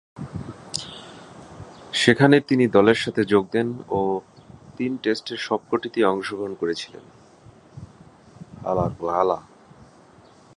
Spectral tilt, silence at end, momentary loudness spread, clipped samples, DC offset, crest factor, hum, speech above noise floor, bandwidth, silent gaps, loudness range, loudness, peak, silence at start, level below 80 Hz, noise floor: -5.5 dB/octave; 1.15 s; 24 LU; under 0.1%; under 0.1%; 22 dB; none; 30 dB; 11.5 kHz; none; 9 LU; -22 LUFS; 0 dBFS; 0.15 s; -54 dBFS; -51 dBFS